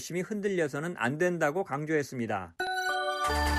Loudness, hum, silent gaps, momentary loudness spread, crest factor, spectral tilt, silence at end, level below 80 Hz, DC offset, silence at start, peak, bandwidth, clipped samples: -31 LUFS; none; none; 5 LU; 16 dB; -5 dB/octave; 0 s; -44 dBFS; under 0.1%; 0 s; -14 dBFS; 14.5 kHz; under 0.1%